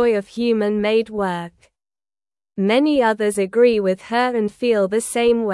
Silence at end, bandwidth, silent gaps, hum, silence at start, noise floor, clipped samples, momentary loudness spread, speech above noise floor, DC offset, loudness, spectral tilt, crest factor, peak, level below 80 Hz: 0 s; 12 kHz; none; none; 0 s; under -90 dBFS; under 0.1%; 8 LU; over 72 dB; under 0.1%; -19 LUFS; -5 dB/octave; 14 dB; -4 dBFS; -56 dBFS